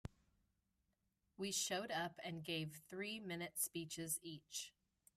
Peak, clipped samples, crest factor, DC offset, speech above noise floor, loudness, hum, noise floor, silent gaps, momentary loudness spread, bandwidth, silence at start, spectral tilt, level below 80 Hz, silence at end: -28 dBFS; under 0.1%; 20 dB; under 0.1%; 40 dB; -45 LUFS; none; -86 dBFS; none; 8 LU; 15.5 kHz; 0.05 s; -2.5 dB/octave; -76 dBFS; 0.45 s